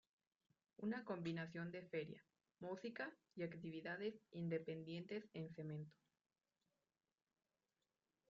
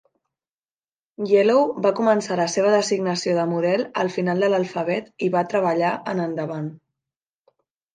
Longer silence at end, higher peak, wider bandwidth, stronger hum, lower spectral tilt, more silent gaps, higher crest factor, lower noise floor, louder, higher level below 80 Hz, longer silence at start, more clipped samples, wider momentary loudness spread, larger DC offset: first, 2.4 s vs 1.2 s; second, -34 dBFS vs -6 dBFS; second, 7.2 kHz vs 9.6 kHz; neither; about the same, -6 dB/octave vs -5.5 dB/octave; neither; about the same, 18 dB vs 16 dB; about the same, under -90 dBFS vs under -90 dBFS; second, -50 LUFS vs -21 LUFS; second, -88 dBFS vs -74 dBFS; second, 0.8 s vs 1.2 s; neither; about the same, 7 LU vs 8 LU; neither